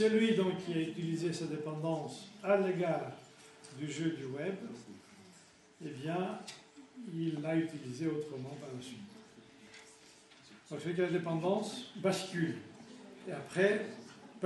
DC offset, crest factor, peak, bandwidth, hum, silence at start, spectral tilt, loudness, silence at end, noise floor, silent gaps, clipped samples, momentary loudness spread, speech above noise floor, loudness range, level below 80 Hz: under 0.1%; 20 dB; -16 dBFS; 11.5 kHz; none; 0 s; -6 dB/octave; -36 LUFS; 0 s; -61 dBFS; none; under 0.1%; 23 LU; 26 dB; 7 LU; -80 dBFS